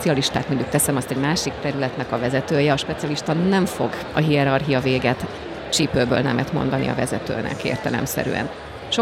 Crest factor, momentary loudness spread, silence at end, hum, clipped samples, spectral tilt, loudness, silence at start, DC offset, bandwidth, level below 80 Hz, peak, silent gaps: 16 dB; 6 LU; 0 s; none; under 0.1%; -5 dB/octave; -21 LUFS; 0 s; under 0.1%; 16.5 kHz; -46 dBFS; -4 dBFS; none